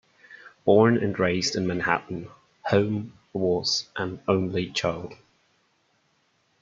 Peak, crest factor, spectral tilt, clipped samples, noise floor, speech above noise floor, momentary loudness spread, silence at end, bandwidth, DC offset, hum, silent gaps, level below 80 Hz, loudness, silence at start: -4 dBFS; 22 dB; -5 dB/octave; under 0.1%; -68 dBFS; 44 dB; 17 LU; 1.5 s; 7.8 kHz; under 0.1%; none; none; -62 dBFS; -25 LUFS; 0.3 s